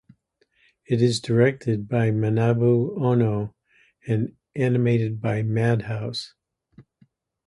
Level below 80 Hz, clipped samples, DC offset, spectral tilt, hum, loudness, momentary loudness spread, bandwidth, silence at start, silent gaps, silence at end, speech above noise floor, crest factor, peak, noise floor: -56 dBFS; under 0.1%; under 0.1%; -7.5 dB/octave; none; -23 LUFS; 10 LU; 11 kHz; 0.9 s; none; 0.65 s; 45 dB; 18 dB; -6 dBFS; -67 dBFS